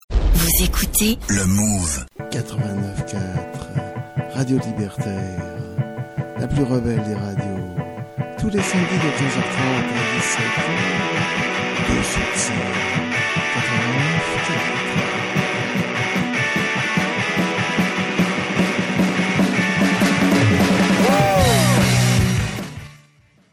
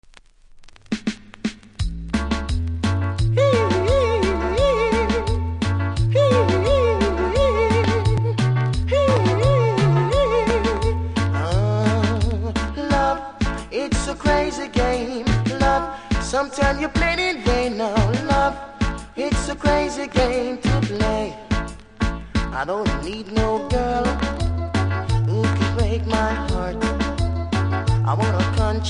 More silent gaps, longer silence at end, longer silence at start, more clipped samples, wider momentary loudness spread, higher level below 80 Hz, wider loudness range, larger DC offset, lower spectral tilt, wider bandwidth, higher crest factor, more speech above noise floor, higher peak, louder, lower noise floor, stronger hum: neither; first, 0.55 s vs 0 s; second, 0.1 s vs 0.55 s; neither; first, 12 LU vs 8 LU; about the same, -32 dBFS vs -28 dBFS; first, 8 LU vs 4 LU; neither; second, -4.5 dB/octave vs -6 dB/octave; first, 17 kHz vs 10.5 kHz; about the same, 16 dB vs 16 dB; first, 34 dB vs 27 dB; about the same, -4 dBFS vs -4 dBFS; about the same, -19 LUFS vs -21 LUFS; first, -54 dBFS vs -48 dBFS; neither